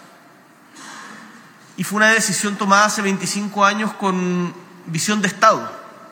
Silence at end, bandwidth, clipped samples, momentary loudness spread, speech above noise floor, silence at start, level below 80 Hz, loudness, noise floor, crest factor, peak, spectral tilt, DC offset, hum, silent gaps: 0.05 s; 17.5 kHz; under 0.1%; 22 LU; 30 dB; 0.75 s; -82 dBFS; -17 LUFS; -48 dBFS; 20 dB; 0 dBFS; -3.5 dB/octave; under 0.1%; none; none